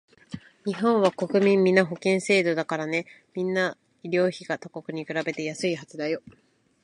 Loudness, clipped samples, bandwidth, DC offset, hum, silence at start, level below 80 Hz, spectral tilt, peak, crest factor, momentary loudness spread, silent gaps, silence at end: -25 LUFS; under 0.1%; 11 kHz; under 0.1%; none; 0.3 s; -70 dBFS; -5.5 dB/octave; -4 dBFS; 22 dB; 14 LU; none; 0.65 s